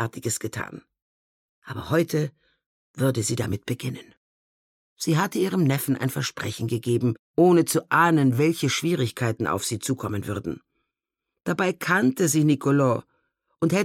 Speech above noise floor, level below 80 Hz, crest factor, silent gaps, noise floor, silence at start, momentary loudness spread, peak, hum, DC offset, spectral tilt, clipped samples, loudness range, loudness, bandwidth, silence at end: 62 dB; -60 dBFS; 18 dB; 1.02-1.62 s, 2.66-2.94 s, 4.17-4.97 s, 7.19-7.34 s; -85 dBFS; 0 s; 12 LU; -6 dBFS; none; under 0.1%; -5.5 dB/octave; under 0.1%; 7 LU; -24 LUFS; 17 kHz; 0 s